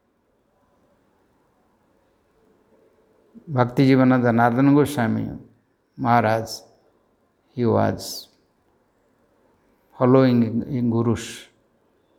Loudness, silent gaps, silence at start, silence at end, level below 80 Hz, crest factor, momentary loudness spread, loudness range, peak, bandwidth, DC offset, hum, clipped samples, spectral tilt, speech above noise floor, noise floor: -20 LUFS; none; 3.45 s; 0.75 s; -58 dBFS; 22 dB; 18 LU; 9 LU; -2 dBFS; 16 kHz; under 0.1%; none; under 0.1%; -7 dB/octave; 47 dB; -66 dBFS